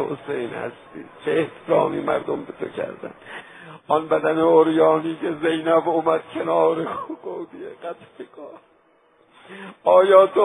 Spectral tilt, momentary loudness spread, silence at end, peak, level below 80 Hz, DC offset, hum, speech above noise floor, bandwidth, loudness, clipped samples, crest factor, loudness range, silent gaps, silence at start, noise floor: -7 dB/octave; 23 LU; 0 s; -2 dBFS; -66 dBFS; under 0.1%; none; 38 dB; 11.5 kHz; -20 LUFS; under 0.1%; 20 dB; 7 LU; none; 0 s; -58 dBFS